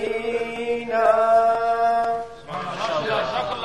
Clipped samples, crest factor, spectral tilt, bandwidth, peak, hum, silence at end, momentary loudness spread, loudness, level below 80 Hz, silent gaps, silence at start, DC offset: under 0.1%; 16 dB; -4.5 dB/octave; 11.5 kHz; -6 dBFS; none; 0 s; 12 LU; -22 LUFS; -56 dBFS; none; 0 s; 0.3%